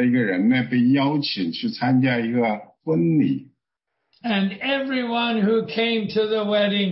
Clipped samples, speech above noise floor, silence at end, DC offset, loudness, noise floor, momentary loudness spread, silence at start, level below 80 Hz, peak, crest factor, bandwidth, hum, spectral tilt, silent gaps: under 0.1%; 59 dB; 0 s; under 0.1%; -21 LUFS; -79 dBFS; 6 LU; 0 s; -66 dBFS; -8 dBFS; 12 dB; 5.8 kHz; none; -10 dB/octave; none